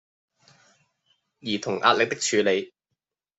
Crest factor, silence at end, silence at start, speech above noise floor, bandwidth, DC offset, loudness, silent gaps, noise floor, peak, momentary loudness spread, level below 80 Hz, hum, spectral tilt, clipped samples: 24 dB; 0.7 s; 1.45 s; 60 dB; 8.2 kHz; under 0.1%; -23 LUFS; none; -83 dBFS; -2 dBFS; 14 LU; -74 dBFS; none; -2.5 dB/octave; under 0.1%